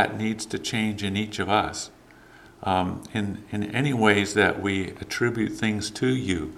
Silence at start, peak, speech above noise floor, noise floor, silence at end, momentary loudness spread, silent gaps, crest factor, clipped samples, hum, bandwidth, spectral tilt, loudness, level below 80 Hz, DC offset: 0 s; -4 dBFS; 25 dB; -50 dBFS; 0 s; 10 LU; none; 22 dB; under 0.1%; none; 14.5 kHz; -5 dB/octave; -25 LUFS; -54 dBFS; under 0.1%